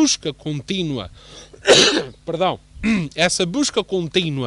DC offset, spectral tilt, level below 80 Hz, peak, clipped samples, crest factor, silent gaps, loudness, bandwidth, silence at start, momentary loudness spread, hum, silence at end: under 0.1%; -3 dB/octave; -46 dBFS; -4 dBFS; under 0.1%; 16 dB; none; -19 LUFS; 11.5 kHz; 0 s; 15 LU; none; 0 s